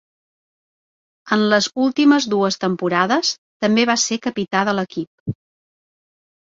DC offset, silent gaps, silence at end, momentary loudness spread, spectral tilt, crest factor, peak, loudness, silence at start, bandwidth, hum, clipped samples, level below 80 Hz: under 0.1%; 3.38-3.60 s, 5.07-5.26 s; 1.15 s; 12 LU; -4 dB/octave; 18 dB; -2 dBFS; -18 LUFS; 1.25 s; 7.8 kHz; none; under 0.1%; -60 dBFS